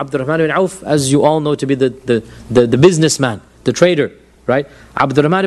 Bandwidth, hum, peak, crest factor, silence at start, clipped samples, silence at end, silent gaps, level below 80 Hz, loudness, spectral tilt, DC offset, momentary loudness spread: 12.5 kHz; none; 0 dBFS; 14 dB; 0 s; under 0.1%; 0 s; none; -46 dBFS; -14 LUFS; -5.5 dB/octave; under 0.1%; 9 LU